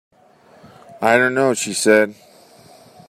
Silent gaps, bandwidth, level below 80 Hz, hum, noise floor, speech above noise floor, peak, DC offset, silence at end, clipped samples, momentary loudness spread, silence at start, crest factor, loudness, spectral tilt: none; 15.5 kHz; -68 dBFS; none; -50 dBFS; 35 dB; -2 dBFS; under 0.1%; 0.95 s; under 0.1%; 6 LU; 0.9 s; 18 dB; -16 LUFS; -3.5 dB/octave